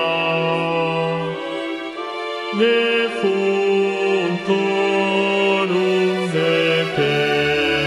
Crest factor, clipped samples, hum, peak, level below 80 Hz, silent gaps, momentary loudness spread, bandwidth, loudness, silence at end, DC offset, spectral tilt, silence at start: 12 dB; under 0.1%; none; -6 dBFS; -56 dBFS; none; 9 LU; 11.5 kHz; -19 LUFS; 0 s; under 0.1%; -5.5 dB/octave; 0 s